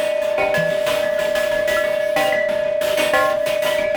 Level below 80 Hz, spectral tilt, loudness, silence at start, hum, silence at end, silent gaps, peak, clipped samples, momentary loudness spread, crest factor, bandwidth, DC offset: -50 dBFS; -3 dB/octave; -18 LUFS; 0 s; none; 0 s; none; -4 dBFS; under 0.1%; 2 LU; 14 dB; over 20 kHz; under 0.1%